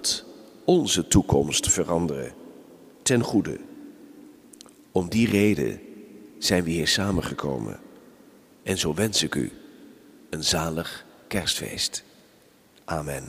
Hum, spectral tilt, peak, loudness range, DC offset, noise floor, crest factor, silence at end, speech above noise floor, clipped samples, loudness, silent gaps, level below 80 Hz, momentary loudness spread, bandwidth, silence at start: none; -4 dB/octave; -4 dBFS; 5 LU; under 0.1%; -57 dBFS; 22 dB; 0 s; 33 dB; under 0.1%; -24 LUFS; none; -46 dBFS; 18 LU; 15.5 kHz; 0 s